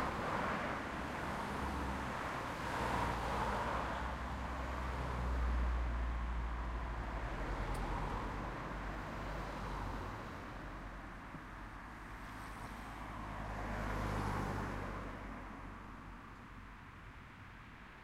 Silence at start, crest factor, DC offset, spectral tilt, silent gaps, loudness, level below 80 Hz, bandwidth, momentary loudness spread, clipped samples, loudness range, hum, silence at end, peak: 0 s; 16 dB; under 0.1%; -6 dB/octave; none; -42 LUFS; -46 dBFS; 14.5 kHz; 14 LU; under 0.1%; 8 LU; none; 0 s; -26 dBFS